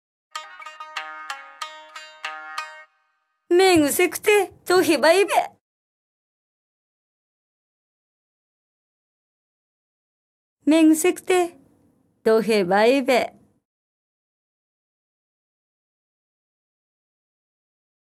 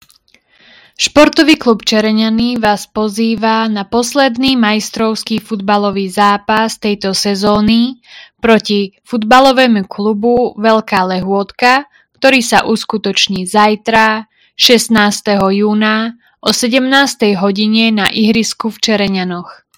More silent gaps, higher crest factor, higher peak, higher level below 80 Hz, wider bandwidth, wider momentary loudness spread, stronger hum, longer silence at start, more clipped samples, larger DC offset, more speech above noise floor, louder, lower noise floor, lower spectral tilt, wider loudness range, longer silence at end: first, 5.61-10.57 s vs none; first, 20 dB vs 12 dB; second, -4 dBFS vs 0 dBFS; second, -68 dBFS vs -46 dBFS; about the same, 16 kHz vs 17 kHz; first, 20 LU vs 8 LU; neither; second, 0.35 s vs 1 s; second, under 0.1% vs 0.7%; neither; first, 52 dB vs 39 dB; second, -19 LUFS vs -12 LUFS; first, -70 dBFS vs -51 dBFS; about the same, -3.5 dB/octave vs -4 dB/octave; first, 10 LU vs 2 LU; first, 4.85 s vs 0.25 s